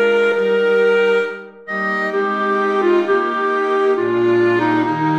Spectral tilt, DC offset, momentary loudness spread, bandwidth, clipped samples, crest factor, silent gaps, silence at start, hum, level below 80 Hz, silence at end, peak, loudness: -6.5 dB/octave; under 0.1%; 5 LU; 8.4 kHz; under 0.1%; 12 dB; none; 0 s; none; -66 dBFS; 0 s; -4 dBFS; -16 LUFS